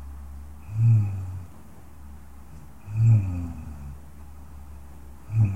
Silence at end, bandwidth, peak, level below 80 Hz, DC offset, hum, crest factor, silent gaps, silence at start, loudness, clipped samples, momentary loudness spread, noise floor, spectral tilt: 0 s; 8 kHz; -10 dBFS; -44 dBFS; 0.6%; none; 16 dB; none; 0 s; -24 LUFS; under 0.1%; 26 LU; -47 dBFS; -9 dB/octave